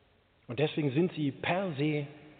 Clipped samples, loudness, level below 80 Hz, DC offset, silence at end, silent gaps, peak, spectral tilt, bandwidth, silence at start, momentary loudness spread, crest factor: under 0.1%; -32 LUFS; -70 dBFS; under 0.1%; 0.05 s; none; -16 dBFS; -5.5 dB/octave; 4.6 kHz; 0.5 s; 4 LU; 16 dB